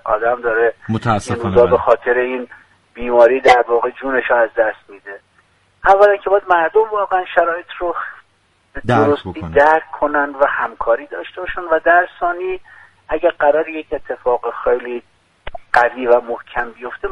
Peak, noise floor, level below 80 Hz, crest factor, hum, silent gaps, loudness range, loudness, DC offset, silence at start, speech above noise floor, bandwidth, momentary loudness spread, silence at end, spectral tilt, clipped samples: 0 dBFS; -58 dBFS; -44 dBFS; 16 dB; none; none; 4 LU; -16 LUFS; under 0.1%; 0.05 s; 43 dB; 11 kHz; 15 LU; 0 s; -6 dB/octave; under 0.1%